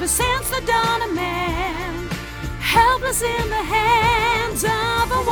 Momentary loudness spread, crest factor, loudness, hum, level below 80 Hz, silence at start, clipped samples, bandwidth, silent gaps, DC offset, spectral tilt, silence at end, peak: 11 LU; 16 dB; -19 LUFS; none; -32 dBFS; 0 s; under 0.1%; over 20 kHz; none; under 0.1%; -3 dB/octave; 0 s; -4 dBFS